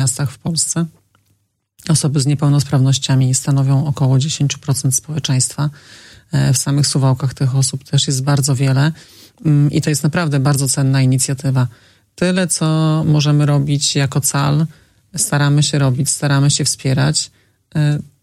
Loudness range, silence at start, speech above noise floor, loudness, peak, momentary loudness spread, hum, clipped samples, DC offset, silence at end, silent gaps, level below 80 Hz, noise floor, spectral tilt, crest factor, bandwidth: 2 LU; 0 s; 48 dB; -15 LUFS; -2 dBFS; 5 LU; none; under 0.1%; under 0.1%; 0.2 s; none; -50 dBFS; -63 dBFS; -4.5 dB/octave; 14 dB; 14.5 kHz